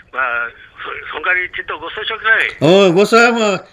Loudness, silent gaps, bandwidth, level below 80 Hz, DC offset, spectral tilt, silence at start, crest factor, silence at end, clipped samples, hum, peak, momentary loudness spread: -13 LUFS; none; 14.5 kHz; -52 dBFS; under 0.1%; -4.5 dB/octave; 0.15 s; 14 dB; 0.1 s; under 0.1%; none; 0 dBFS; 16 LU